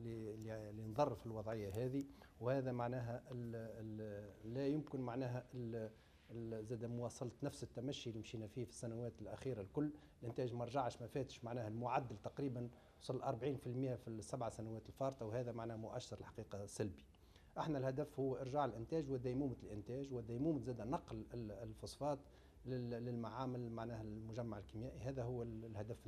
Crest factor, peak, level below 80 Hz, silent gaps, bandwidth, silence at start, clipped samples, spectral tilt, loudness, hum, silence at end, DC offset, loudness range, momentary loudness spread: 22 dB; -24 dBFS; -68 dBFS; none; 13.5 kHz; 0 s; under 0.1%; -7 dB/octave; -46 LUFS; none; 0 s; under 0.1%; 4 LU; 9 LU